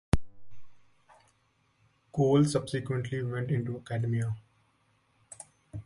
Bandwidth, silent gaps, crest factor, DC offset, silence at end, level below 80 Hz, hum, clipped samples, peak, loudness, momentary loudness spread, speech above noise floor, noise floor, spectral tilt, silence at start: 11.5 kHz; none; 22 dB; under 0.1%; 0.05 s; -48 dBFS; none; under 0.1%; -8 dBFS; -30 LUFS; 22 LU; 42 dB; -71 dBFS; -7 dB/octave; 0.15 s